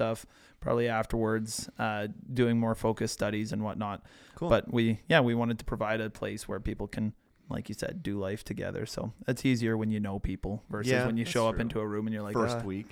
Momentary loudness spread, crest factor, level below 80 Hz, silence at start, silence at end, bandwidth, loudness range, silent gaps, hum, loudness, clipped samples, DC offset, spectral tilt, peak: 9 LU; 22 dB; -48 dBFS; 0 s; 0.05 s; 16.5 kHz; 5 LU; none; none; -31 LUFS; under 0.1%; under 0.1%; -6 dB/octave; -8 dBFS